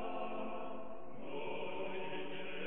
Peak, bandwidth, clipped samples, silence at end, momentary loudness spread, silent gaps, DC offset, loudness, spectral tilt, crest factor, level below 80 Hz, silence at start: -28 dBFS; 4 kHz; under 0.1%; 0 s; 6 LU; none; 0.9%; -44 LUFS; -3 dB/octave; 14 dB; -74 dBFS; 0 s